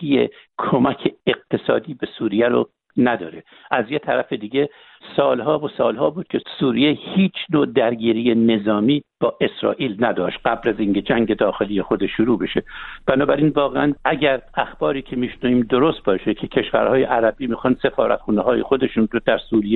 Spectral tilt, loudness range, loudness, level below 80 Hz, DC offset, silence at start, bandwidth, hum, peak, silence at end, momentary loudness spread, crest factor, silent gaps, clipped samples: -10 dB/octave; 3 LU; -20 LUFS; -48 dBFS; under 0.1%; 0 s; 4.3 kHz; none; -2 dBFS; 0 s; 6 LU; 18 dB; none; under 0.1%